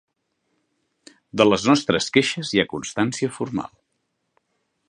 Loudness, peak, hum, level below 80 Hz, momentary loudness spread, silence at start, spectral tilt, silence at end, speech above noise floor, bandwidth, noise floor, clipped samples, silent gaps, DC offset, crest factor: -21 LUFS; 0 dBFS; none; -58 dBFS; 11 LU; 1.35 s; -4.5 dB/octave; 1.2 s; 53 dB; 11 kHz; -74 dBFS; under 0.1%; none; under 0.1%; 24 dB